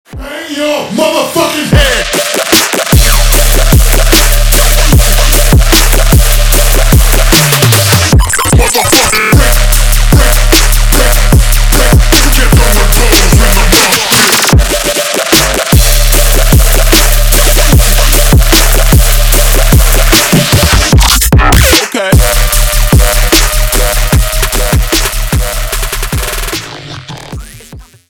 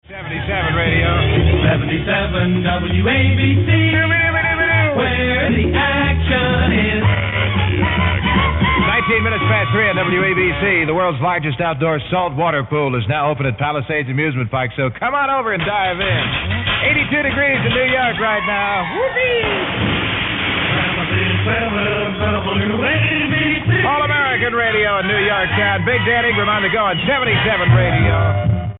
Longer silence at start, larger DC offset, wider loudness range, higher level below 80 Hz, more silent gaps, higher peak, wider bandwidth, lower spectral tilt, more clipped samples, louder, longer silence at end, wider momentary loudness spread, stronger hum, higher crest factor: about the same, 0.1 s vs 0.1 s; neither; about the same, 3 LU vs 3 LU; first, -8 dBFS vs -30 dBFS; neither; about the same, 0 dBFS vs -2 dBFS; first, over 20 kHz vs 4.1 kHz; second, -3.5 dB/octave vs -11 dB/octave; first, 1% vs under 0.1%; first, -7 LUFS vs -16 LUFS; first, 0.25 s vs 0 s; first, 7 LU vs 4 LU; neither; second, 6 dB vs 14 dB